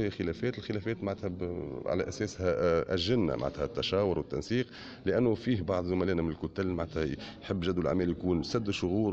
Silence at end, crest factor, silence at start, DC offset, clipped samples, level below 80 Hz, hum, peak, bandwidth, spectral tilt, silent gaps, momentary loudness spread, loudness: 0 s; 16 dB; 0 s; under 0.1%; under 0.1%; -52 dBFS; none; -16 dBFS; 8.2 kHz; -6.5 dB/octave; none; 7 LU; -32 LUFS